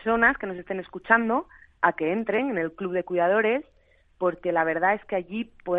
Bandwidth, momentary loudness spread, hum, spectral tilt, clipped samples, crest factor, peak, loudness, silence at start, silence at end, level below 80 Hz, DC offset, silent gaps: 4 kHz; 11 LU; none; -8.5 dB/octave; under 0.1%; 22 dB; -4 dBFS; -25 LUFS; 0 s; 0 s; -58 dBFS; under 0.1%; none